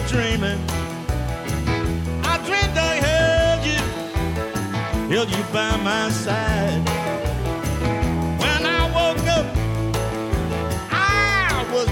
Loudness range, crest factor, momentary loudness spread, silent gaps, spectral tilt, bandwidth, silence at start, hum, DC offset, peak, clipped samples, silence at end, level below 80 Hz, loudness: 2 LU; 14 dB; 7 LU; none; -5 dB/octave; 17 kHz; 0 s; none; under 0.1%; -6 dBFS; under 0.1%; 0 s; -30 dBFS; -21 LUFS